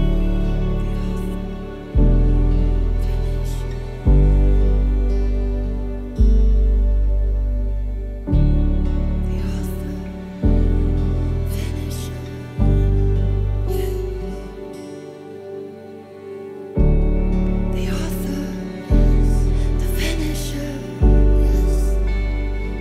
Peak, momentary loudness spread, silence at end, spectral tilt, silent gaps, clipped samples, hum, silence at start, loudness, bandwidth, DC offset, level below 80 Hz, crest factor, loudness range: -4 dBFS; 13 LU; 0 s; -7.5 dB/octave; none; under 0.1%; none; 0 s; -21 LUFS; 13.5 kHz; under 0.1%; -18 dBFS; 14 dB; 5 LU